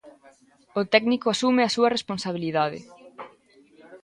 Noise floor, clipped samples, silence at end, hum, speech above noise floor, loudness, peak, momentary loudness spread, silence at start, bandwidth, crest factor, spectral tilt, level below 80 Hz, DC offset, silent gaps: -56 dBFS; under 0.1%; 0.05 s; none; 33 dB; -23 LUFS; -4 dBFS; 23 LU; 0.05 s; 11.5 kHz; 22 dB; -4.5 dB/octave; -68 dBFS; under 0.1%; none